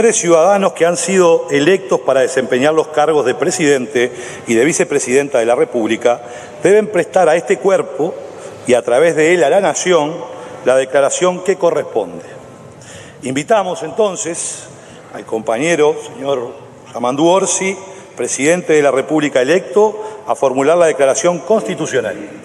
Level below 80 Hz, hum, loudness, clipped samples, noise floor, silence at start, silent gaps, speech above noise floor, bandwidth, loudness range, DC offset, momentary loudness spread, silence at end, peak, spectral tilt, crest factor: -62 dBFS; none; -14 LUFS; under 0.1%; -36 dBFS; 0 s; none; 22 dB; 12.5 kHz; 5 LU; under 0.1%; 14 LU; 0 s; 0 dBFS; -4 dB/octave; 14 dB